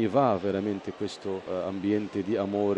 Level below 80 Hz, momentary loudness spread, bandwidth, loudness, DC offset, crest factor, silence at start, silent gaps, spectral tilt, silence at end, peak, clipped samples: -68 dBFS; 10 LU; 9.2 kHz; -29 LUFS; under 0.1%; 18 dB; 0 s; none; -7.5 dB/octave; 0 s; -10 dBFS; under 0.1%